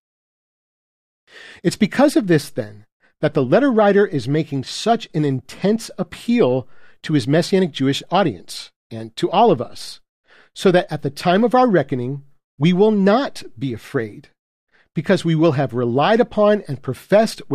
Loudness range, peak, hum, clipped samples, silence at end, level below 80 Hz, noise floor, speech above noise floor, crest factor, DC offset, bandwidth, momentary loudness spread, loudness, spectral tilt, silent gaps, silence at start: 3 LU; -4 dBFS; none; under 0.1%; 0 s; -60 dBFS; under -90 dBFS; over 72 dB; 14 dB; under 0.1%; 14.5 kHz; 14 LU; -18 LUFS; -6.5 dB/octave; 2.92-3.00 s, 8.76-8.90 s, 10.09-10.24 s, 12.44-12.58 s, 14.39-14.67 s; 1.35 s